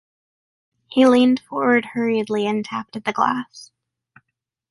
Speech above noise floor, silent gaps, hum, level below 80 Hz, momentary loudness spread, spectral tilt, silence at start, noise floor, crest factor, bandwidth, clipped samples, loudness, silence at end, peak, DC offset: 60 dB; none; none; -66 dBFS; 12 LU; -5.5 dB/octave; 0.9 s; -79 dBFS; 18 dB; 11.5 kHz; under 0.1%; -19 LUFS; 1.05 s; -4 dBFS; under 0.1%